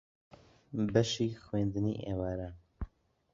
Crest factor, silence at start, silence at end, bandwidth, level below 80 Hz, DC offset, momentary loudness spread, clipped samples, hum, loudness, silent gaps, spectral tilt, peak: 22 dB; 0.7 s; 0.5 s; 7.6 kHz; -52 dBFS; under 0.1%; 17 LU; under 0.1%; none; -34 LUFS; none; -6 dB/octave; -12 dBFS